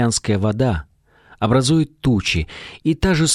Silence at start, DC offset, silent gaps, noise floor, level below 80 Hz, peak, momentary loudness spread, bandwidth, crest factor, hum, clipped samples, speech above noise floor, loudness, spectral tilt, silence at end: 0 s; under 0.1%; none; -51 dBFS; -36 dBFS; -4 dBFS; 8 LU; 13.5 kHz; 14 dB; none; under 0.1%; 33 dB; -19 LUFS; -5 dB/octave; 0 s